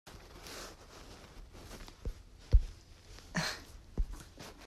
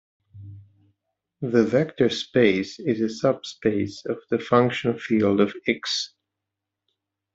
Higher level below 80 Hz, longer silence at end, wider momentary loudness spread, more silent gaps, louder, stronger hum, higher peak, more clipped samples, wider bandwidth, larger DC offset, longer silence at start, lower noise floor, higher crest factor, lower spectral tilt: first, -38 dBFS vs -62 dBFS; second, 0 s vs 1.25 s; first, 21 LU vs 8 LU; neither; second, -40 LUFS vs -23 LUFS; neither; second, -12 dBFS vs -4 dBFS; neither; first, 14 kHz vs 8 kHz; neither; second, 0.05 s vs 0.35 s; second, -54 dBFS vs -85 dBFS; about the same, 24 dB vs 20 dB; about the same, -4.5 dB/octave vs -5.5 dB/octave